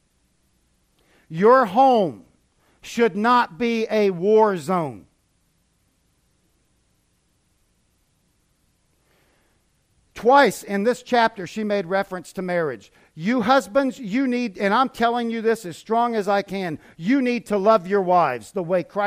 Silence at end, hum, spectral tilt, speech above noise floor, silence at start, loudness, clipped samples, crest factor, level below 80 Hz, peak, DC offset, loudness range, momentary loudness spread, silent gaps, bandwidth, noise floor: 0 s; none; -5.5 dB/octave; 46 dB; 1.3 s; -21 LUFS; under 0.1%; 20 dB; -62 dBFS; -2 dBFS; under 0.1%; 4 LU; 12 LU; none; 15.5 kHz; -66 dBFS